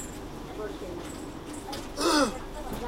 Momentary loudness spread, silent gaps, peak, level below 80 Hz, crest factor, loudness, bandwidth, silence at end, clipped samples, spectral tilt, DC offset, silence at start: 15 LU; none; -12 dBFS; -44 dBFS; 20 dB; -31 LUFS; 16 kHz; 0 s; under 0.1%; -3.5 dB/octave; under 0.1%; 0 s